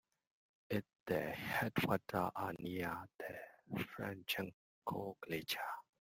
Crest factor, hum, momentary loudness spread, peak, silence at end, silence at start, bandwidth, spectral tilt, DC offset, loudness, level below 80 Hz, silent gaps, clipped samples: 22 dB; none; 11 LU; -22 dBFS; 0.2 s; 0.7 s; 16.5 kHz; -5 dB/octave; under 0.1%; -42 LUFS; -72 dBFS; 1.00-1.06 s, 4.54-4.82 s; under 0.1%